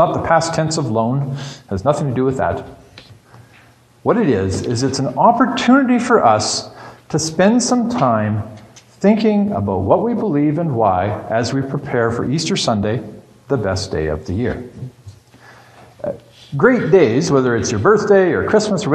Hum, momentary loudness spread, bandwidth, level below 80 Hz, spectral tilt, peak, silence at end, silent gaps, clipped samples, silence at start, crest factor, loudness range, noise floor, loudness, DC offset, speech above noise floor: none; 13 LU; 12 kHz; -46 dBFS; -5.5 dB/octave; 0 dBFS; 0 s; none; under 0.1%; 0 s; 16 dB; 6 LU; -48 dBFS; -16 LUFS; under 0.1%; 33 dB